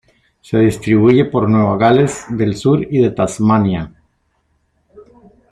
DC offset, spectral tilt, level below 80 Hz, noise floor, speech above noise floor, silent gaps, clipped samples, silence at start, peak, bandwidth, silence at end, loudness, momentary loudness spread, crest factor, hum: under 0.1%; -7 dB/octave; -46 dBFS; -63 dBFS; 50 dB; none; under 0.1%; 0.5 s; -2 dBFS; 12.5 kHz; 1.65 s; -14 LUFS; 7 LU; 14 dB; none